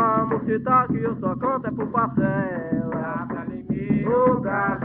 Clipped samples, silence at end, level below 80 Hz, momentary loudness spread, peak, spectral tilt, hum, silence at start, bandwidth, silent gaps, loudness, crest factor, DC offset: under 0.1%; 0 s; -50 dBFS; 9 LU; -6 dBFS; -9 dB/octave; none; 0 s; 3.8 kHz; none; -23 LUFS; 16 dB; under 0.1%